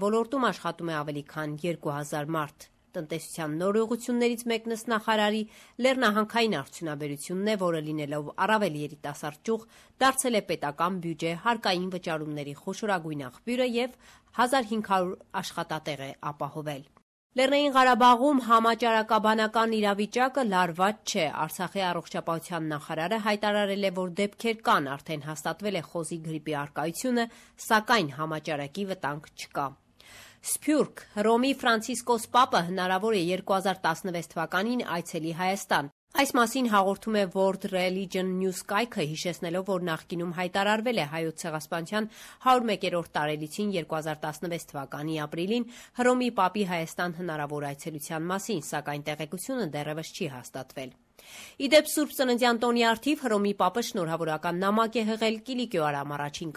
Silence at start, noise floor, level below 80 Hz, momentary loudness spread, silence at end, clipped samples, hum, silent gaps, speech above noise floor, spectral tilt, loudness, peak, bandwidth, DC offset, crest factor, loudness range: 0 s; -52 dBFS; -68 dBFS; 11 LU; 0 s; under 0.1%; none; 17.02-17.30 s, 35.92-36.07 s; 24 dB; -4.5 dB/octave; -28 LUFS; -10 dBFS; 14.5 kHz; under 0.1%; 18 dB; 6 LU